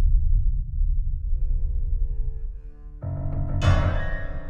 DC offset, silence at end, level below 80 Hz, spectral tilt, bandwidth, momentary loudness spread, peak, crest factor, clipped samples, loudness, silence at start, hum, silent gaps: under 0.1%; 0 s; -24 dBFS; -7 dB/octave; 7 kHz; 14 LU; -8 dBFS; 14 dB; under 0.1%; -28 LUFS; 0 s; none; none